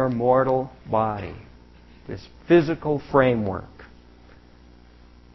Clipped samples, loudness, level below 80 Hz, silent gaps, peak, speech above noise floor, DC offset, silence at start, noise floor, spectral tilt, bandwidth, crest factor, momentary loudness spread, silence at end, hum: under 0.1%; -22 LUFS; -48 dBFS; none; -4 dBFS; 28 dB; under 0.1%; 0 s; -50 dBFS; -9 dB/octave; 6 kHz; 20 dB; 19 LU; 1.5 s; 60 Hz at -50 dBFS